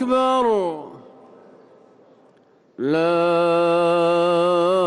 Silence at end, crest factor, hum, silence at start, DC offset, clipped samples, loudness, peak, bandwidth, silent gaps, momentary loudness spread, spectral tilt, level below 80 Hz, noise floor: 0 s; 12 dB; none; 0 s; under 0.1%; under 0.1%; -19 LUFS; -8 dBFS; 11 kHz; none; 10 LU; -6 dB/octave; -64 dBFS; -55 dBFS